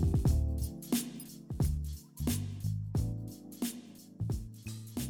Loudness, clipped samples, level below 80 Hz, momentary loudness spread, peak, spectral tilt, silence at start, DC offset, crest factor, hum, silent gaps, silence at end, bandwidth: -36 LUFS; under 0.1%; -40 dBFS; 13 LU; -20 dBFS; -6 dB/octave; 0 s; under 0.1%; 14 dB; none; none; 0 s; 19 kHz